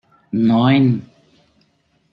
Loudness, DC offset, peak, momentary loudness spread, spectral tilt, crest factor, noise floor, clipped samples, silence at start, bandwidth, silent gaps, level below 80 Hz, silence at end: -16 LUFS; under 0.1%; -2 dBFS; 12 LU; -9.5 dB/octave; 16 dB; -62 dBFS; under 0.1%; 0.35 s; 5.2 kHz; none; -58 dBFS; 1.1 s